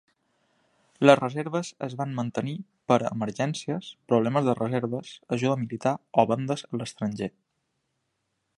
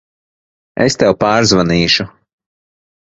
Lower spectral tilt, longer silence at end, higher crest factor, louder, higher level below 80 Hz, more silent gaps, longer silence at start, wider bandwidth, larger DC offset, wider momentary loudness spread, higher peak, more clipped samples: first, -6.5 dB/octave vs -4.5 dB/octave; first, 1.3 s vs 1 s; first, 26 dB vs 16 dB; second, -27 LUFS vs -12 LUFS; second, -68 dBFS vs -40 dBFS; neither; first, 1 s vs 0.75 s; first, 11.5 kHz vs 8 kHz; neither; about the same, 12 LU vs 10 LU; about the same, -2 dBFS vs 0 dBFS; neither